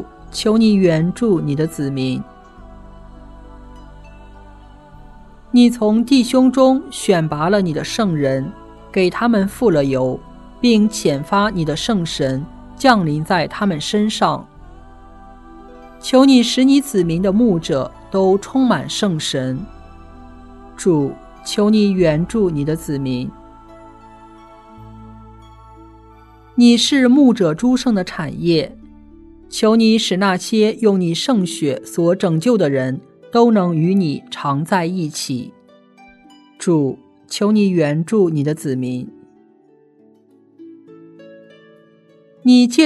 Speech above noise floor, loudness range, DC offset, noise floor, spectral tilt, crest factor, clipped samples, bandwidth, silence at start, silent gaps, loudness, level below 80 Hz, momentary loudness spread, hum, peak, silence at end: 36 dB; 7 LU; under 0.1%; -51 dBFS; -5.5 dB/octave; 18 dB; under 0.1%; 12.5 kHz; 0 s; none; -16 LUFS; -44 dBFS; 12 LU; none; 0 dBFS; 0 s